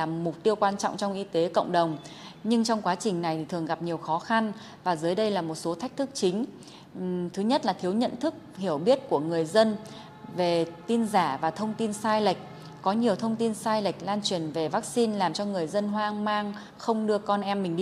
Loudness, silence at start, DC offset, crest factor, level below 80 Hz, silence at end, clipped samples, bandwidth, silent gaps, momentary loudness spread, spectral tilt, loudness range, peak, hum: -28 LUFS; 0 s; under 0.1%; 20 dB; -70 dBFS; 0 s; under 0.1%; 13.5 kHz; none; 8 LU; -5 dB/octave; 2 LU; -8 dBFS; none